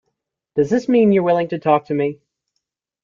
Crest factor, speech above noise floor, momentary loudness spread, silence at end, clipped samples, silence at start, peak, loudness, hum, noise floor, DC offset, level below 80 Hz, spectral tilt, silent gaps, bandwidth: 16 dB; 60 dB; 8 LU; 0.9 s; under 0.1%; 0.55 s; -4 dBFS; -18 LUFS; none; -77 dBFS; under 0.1%; -60 dBFS; -8 dB/octave; none; 7.4 kHz